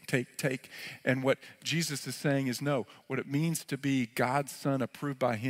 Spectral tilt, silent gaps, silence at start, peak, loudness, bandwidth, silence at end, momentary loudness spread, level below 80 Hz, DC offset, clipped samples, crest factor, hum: -5 dB/octave; none; 0.1 s; -14 dBFS; -32 LUFS; 16 kHz; 0 s; 5 LU; -76 dBFS; under 0.1%; under 0.1%; 20 dB; none